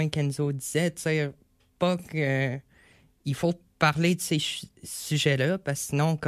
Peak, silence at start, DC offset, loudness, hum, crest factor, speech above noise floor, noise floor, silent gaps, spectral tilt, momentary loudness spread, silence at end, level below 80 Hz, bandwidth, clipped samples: -8 dBFS; 0 s; under 0.1%; -27 LUFS; none; 20 dB; 33 dB; -59 dBFS; none; -5 dB/octave; 10 LU; 0 s; -62 dBFS; 15 kHz; under 0.1%